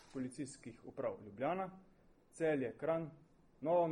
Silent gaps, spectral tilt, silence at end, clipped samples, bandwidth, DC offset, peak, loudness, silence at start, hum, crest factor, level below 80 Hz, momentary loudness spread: none; -6.5 dB/octave; 0 s; under 0.1%; 11 kHz; under 0.1%; -24 dBFS; -41 LUFS; 0.15 s; none; 18 dB; -72 dBFS; 12 LU